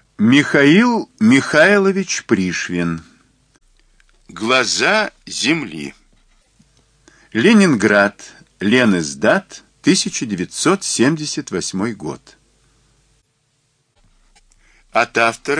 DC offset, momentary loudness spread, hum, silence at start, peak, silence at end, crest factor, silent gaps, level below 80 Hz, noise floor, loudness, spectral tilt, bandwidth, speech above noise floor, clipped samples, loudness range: under 0.1%; 12 LU; none; 0.2 s; 0 dBFS; 0 s; 18 dB; none; -56 dBFS; -64 dBFS; -15 LUFS; -4 dB/octave; 10.5 kHz; 49 dB; under 0.1%; 8 LU